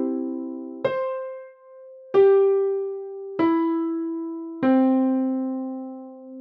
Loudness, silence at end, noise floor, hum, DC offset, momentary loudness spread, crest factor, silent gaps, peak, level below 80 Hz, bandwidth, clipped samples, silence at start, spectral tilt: -23 LUFS; 0 s; -45 dBFS; none; under 0.1%; 16 LU; 16 dB; none; -8 dBFS; -76 dBFS; 4.7 kHz; under 0.1%; 0 s; -9 dB/octave